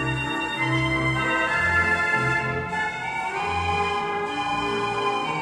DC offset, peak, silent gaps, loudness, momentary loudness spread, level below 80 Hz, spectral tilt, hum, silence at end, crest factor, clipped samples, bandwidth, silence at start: under 0.1%; -10 dBFS; none; -23 LUFS; 6 LU; -46 dBFS; -5 dB/octave; none; 0 s; 14 dB; under 0.1%; 12.5 kHz; 0 s